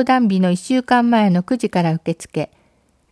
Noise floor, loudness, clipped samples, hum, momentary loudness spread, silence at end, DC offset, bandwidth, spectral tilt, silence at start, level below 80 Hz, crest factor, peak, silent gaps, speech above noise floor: -59 dBFS; -17 LUFS; under 0.1%; none; 11 LU; 0.65 s; under 0.1%; 11 kHz; -6.5 dB/octave; 0 s; -58 dBFS; 14 dB; -4 dBFS; none; 42 dB